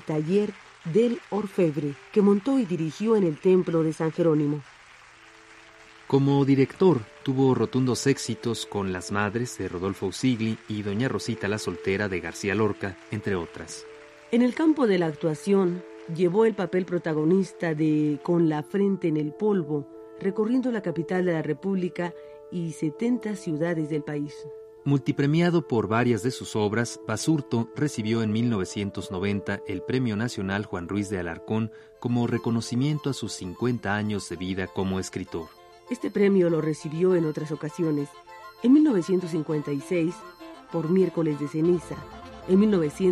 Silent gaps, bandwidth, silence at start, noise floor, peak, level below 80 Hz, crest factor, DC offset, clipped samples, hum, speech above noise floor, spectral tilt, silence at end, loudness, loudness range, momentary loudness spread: none; 13.5 kHz; 0 s; -51 dBFS; -8 dBFS; -62 dBFS; 18 dB; under 0.1%; under 0.1%; none; 26 dB; -6.5 dB/octave; 0 s; -26 LUFS; 4 LU; 11 LU